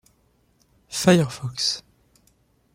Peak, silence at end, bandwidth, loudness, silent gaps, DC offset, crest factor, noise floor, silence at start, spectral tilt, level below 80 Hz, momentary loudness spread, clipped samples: -4 dBFS; 0.95 s; 16 kHz; -22 LUFS; none; under 0.1%; 22 dB; -63 dBFS; 0.9 s; -4.5 dB/octave; -58 dBFS; 13 LU; under 0.1%